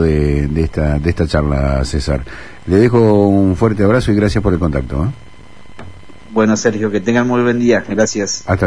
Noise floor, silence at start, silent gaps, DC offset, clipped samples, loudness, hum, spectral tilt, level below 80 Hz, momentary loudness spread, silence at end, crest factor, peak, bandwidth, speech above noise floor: -39 dBFS; 0 s; none; 2%; under 0.1%; -14 LUFS; none; -6.5 dB/octave; -26 dBFS; 9 LU; 0 s; 14 dB; 0 dBFS; 10.5 kHz; 25 dB